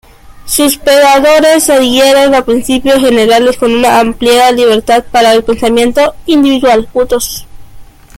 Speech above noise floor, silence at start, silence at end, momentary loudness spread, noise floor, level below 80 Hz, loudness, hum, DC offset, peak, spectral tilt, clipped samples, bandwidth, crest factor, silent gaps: 23 dB; 0.25 s; 0.35 s; 6 LU; -30 dBFS; -34 dBFS; -7 LUFS; none; under 0.1%; 0 dBFS; -2.5 dB/octave; under 0.1%; 17 kHz; 8 dB; none